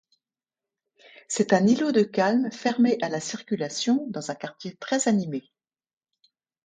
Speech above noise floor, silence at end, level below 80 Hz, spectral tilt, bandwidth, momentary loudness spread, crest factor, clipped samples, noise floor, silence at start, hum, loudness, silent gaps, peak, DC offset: over 66 dB; 1.25 s; -74 dBFS; -4.5 dB/octave; 9.6 kHz; 13 LU; 20 dB; under 0.1%; under -90 dBFS; 1.3 s; none; -25 LUFS; none; -6 dBFS; under 0.1%